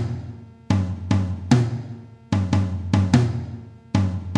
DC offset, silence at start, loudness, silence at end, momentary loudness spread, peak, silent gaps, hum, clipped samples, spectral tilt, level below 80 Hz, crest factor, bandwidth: under 0.1%; 0 s; -23 LUFS; 0 s; 18 LU; -4 dBFS; none; none; under 0.1%; -7 dB/octave; -46 dBFS; 18 dB; 9.6 kHz